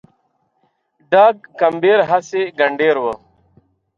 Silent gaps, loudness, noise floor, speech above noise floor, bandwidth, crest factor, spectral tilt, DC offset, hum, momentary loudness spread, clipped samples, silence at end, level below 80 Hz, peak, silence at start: none; -15 LUFS; -65 dBFS; 50 dB; 7.4 kHz; 16 dB; -5 dB/octave; under 0.1%; none; 9 LU; under 0.1%; 0.8 s; -64 dBFS; -2 dBFS; 1.1 s